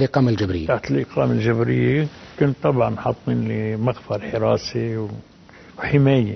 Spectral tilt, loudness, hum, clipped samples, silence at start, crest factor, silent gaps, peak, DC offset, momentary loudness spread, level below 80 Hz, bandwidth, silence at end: -8 dB/octave; -21 LUFS; none; under 0.1%; 0 s; 18 dB; none; -2 dBFS; under 0.1%; 8 LU; -46 dBFS; 6.4 kHz; 0 s